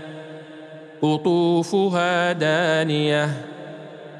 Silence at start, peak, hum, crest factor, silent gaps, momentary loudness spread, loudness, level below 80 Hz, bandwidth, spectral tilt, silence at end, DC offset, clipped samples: 0 s; -8 dBFS; none; 14 dB; none; 19 LU; -20 LUFS; -76 dBFS; 11.5 kHz; -6 dB/octave; 0 s; under 0.1%; under 0.1%